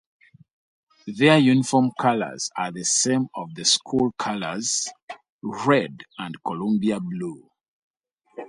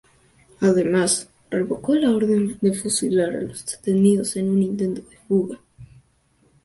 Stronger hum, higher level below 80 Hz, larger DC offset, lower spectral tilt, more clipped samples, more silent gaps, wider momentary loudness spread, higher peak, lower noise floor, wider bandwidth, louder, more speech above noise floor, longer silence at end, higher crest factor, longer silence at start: neither; second, -64 dBFS vs -58 dBFS; neither; second, -3.5 dB/octave vs -5.5 dB/octave; neither; first, 5.02-5.08 s, 5.29-5.39 s, 7.68-7.94 s vs none; first, 17 LU vs 10 LU; first, -2 dBFS vs -6 dBFS; second, -44 dBFS vs -61 dBFS; about the same, 11.5 kHz vs 12 kHz; about the same, -22 LUFS vs -21 LUFS; second, 21 dB vs 41 dB; second, 0 s vs 0.8 s; first, 22 dB vs 16 dB; first, 1.05 s vs 0.6 s